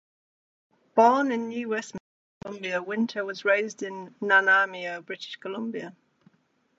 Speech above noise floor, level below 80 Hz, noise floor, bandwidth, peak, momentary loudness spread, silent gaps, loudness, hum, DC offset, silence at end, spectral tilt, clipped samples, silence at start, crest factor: 43 dB; -76 dBFS; -69 dBFS; 8 kHz; -6 dBFS; 18 LU; 2.00-2.41 s; -26 LUFS; none; under 0.1%; 0.9 s; -4 dB/octave; under 0.1%; 0.95 s; 22 dB